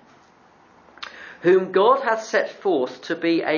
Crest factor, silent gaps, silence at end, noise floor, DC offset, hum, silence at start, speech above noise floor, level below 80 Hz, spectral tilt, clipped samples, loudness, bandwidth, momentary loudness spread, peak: 18 dB; none; 0 s; -54 dBFS; under 0.1%; none; 1 s; 34 dB; -74 dBFS; -5 dB/octave; under 0.1%; -21 LUFS; 7.2 kHz; 19 LU; -4 dBFS